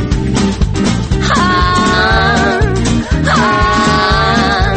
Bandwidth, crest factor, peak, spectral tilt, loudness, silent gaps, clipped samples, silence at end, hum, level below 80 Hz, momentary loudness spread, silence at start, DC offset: 8.8 kHz; 10 dB; 0 dBFS; -5 dB/octave; -11 LUFS; none; under 0.1%; 0 s; none; -20 dBFS; 4 LU; 0 s; under 0.1%